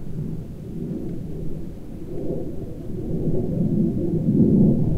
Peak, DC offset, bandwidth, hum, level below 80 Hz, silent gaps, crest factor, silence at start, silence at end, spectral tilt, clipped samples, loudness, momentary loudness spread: -4 dBFS; under 0.1%; 4.9 kHz; none; -34 dBFS; none; 18 dB; 0 s; 0 s; -11.5 dB/octave; under 0.1%; -24 LUFS; 16 LU